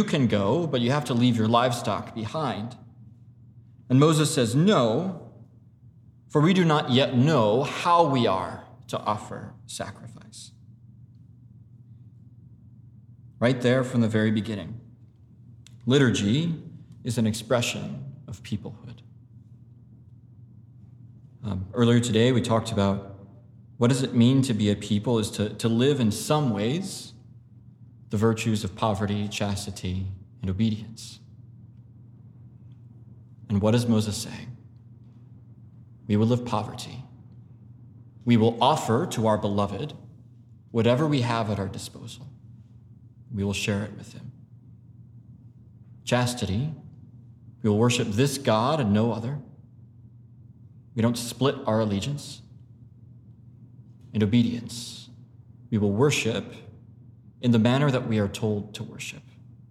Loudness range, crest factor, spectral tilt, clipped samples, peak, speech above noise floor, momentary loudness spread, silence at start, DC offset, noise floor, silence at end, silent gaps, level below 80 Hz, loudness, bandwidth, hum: 10 LU; 20 dB; -6 dB/octave; under 0.1%; -6 dBFS; 28 dB; 20 LU; 0 s; under 0.1%; -52 dBFS; 0.5 s; none; -60 dBFS; -25 LUFS; 14.5 kHz; none